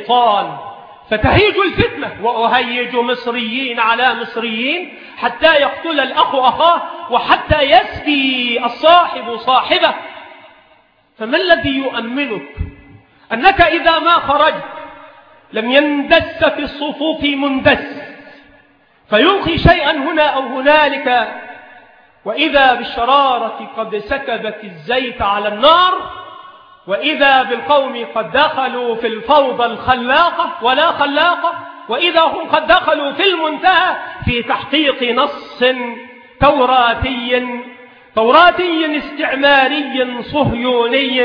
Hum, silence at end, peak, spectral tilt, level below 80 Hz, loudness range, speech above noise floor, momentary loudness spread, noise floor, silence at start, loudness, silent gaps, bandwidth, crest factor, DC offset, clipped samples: none; 0 s; 0 dBFS; -7 dB/octave; -38 dBFS; 3 LU; 38 dB; 13 LU; -52 dBFS; 0 s; -13 LUFS; none; 5.4 kHz; 14 dB; under 0.1%; under 0.1%